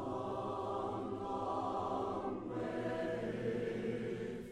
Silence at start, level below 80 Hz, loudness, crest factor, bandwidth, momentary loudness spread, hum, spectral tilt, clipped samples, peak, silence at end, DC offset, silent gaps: 0 s; -64 dBFS; -40 LUFS; 14 dB; 12.5 kHz; 3 LU; none; -7 dB/octave; under 0.1%; -26 dBFS; 0 s; under 0.1%; none